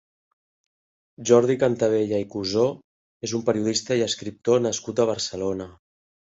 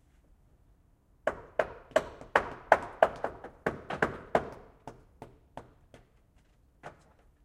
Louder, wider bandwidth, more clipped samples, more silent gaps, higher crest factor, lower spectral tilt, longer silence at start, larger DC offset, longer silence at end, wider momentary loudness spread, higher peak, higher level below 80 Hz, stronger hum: first, -23 LUFS vs -32 LUFS; second, 8 kHz vs 14.5 kHz; neither; first, 2.84-3.20 s vs none; second, 20 dB vs 30 dB; about the same, -4.5 dB/octave vs -5 dB/octave; about the same, 1.2 s vs 1.25 s; neither; about the same, 0.6 s vs 0.55 s; second, 12 LU vs 24 LU; about the same, -4 dBFS vs -4 dBFS; about the same, -58 dBFS vs -58 dBFS; neither